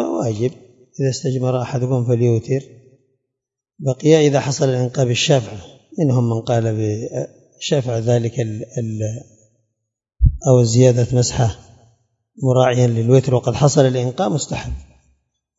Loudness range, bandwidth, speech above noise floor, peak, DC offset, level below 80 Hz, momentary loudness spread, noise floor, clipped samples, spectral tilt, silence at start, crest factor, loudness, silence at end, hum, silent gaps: 5 LU; 7.8 kHz; 66 dB; 0 dBFS; under 0.1%; -34 dBFS; 13 LU; -82 dBFS; under 0.1%; -6 dB/octave; 0 s; 18 dB; -18 LUFS; 0.75 s; none; none